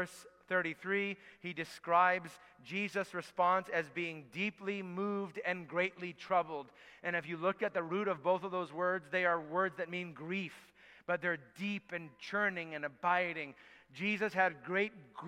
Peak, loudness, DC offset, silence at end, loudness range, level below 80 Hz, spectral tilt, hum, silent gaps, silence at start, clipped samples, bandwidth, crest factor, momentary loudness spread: -16 dBFS; -36 LUFS; under 0.1%; 0 s; 3 LU; -82 dBFS; -5.5 dB/octave; none; none; 0 s; under 0.1%; 15 kHz; 22 dB; 12 LU